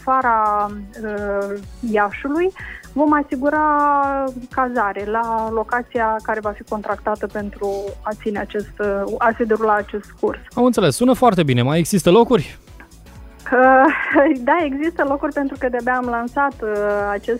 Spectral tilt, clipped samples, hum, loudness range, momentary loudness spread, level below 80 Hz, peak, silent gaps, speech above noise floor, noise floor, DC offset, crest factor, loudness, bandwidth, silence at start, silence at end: -6 dB/octave; under 0.1%; none; 6 LU; 11 LU; -42 dBFS; -2 dBFS; none; 23 dB; -41 dBFS; under 0.1%; 18 dB; -18 LUFS; 16 kHz; 0 s; 0 s